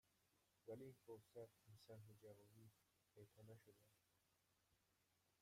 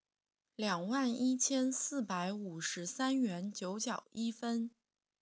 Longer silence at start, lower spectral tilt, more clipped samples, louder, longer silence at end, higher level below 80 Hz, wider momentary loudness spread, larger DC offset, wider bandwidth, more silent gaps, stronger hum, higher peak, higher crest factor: second, 0.05 s vs 0.6 s; first, -6.5 dB/octave vs -3.5 dB/octave; neither; second, -64 LUFS vs -36 LUFS; second, 0 s vs 0.55 s; about the same, under -90 dBFS vs -90 dBFS; about the same, 8 LU vs 8 LU; neither; first, 15.5 kHz vs 8 kHz; neither; neither; second, -46 dBFS vs -20 dBFS; about the same, 20 dB vs 18 dB